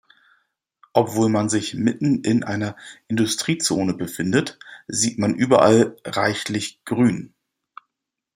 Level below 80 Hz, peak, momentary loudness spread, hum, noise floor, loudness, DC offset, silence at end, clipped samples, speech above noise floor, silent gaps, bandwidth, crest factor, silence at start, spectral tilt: -62 dBFS; -2 dBFS; 11 LU; none; -82 dBFS; -21 LUFS; under 0.1%; 1.1 s; under 0.1%; 62 dB; none; 15.5 kHz; 20 dB; 0.95 s; -4.5 dB/octave